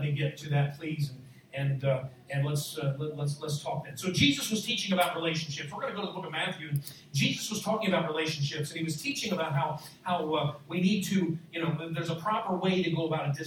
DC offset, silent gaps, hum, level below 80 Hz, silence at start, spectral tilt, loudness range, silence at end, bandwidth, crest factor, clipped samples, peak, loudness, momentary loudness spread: under 0.1%; none; none; -68 dBFS; 0 s; -5 dB/octave; 3 LU; 0 s; 19 kHz; 20 dB; under 0.1%; -10 dBFS; -31 LUFS; 8 LU